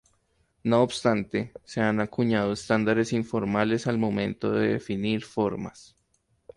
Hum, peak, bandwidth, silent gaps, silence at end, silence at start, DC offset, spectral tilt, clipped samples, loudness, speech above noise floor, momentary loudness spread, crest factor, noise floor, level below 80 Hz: none; -8 dBFS; 11 kHz; none; 0.75 s; 0.65 s; under 0.1%; -6 dB/octave; under 0.1%; -26 LUFS; 45 dB; 7 LU; 18 dB; -70 dBFS; -58 dBFS